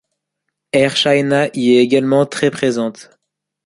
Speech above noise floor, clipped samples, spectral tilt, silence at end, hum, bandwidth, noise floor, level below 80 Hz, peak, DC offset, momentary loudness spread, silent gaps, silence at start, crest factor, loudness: 62 dB; under 0.1%; -5 dB/octave; 0.65 s; none; 11.5 kHz; -76 dBFS; -58 dBFS; -2 dBFS; under 0.1%; 6 LU; none; 0.75 s; 14 dB; -15 LUFS